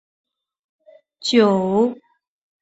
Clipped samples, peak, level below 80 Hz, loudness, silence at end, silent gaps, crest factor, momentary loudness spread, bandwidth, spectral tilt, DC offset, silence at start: under 0.1%; -2 dBFS; -64 dBFS; -18 LUFS; 0.7 s; none; 20 dB; 7 LU; 8 kHz; -5.5 dB/octave; under 0.1%; 1.2 s